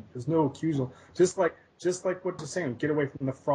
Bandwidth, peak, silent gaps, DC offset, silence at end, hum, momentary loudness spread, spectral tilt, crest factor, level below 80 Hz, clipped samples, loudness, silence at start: 10.5 kHz; -12 dBFS; none; under 0.1%; 0 s; none; 7 LU; -6 dB/octave; 16 dB; -66 dBFS; under 0.1%; -29 LUFS; 0.15 s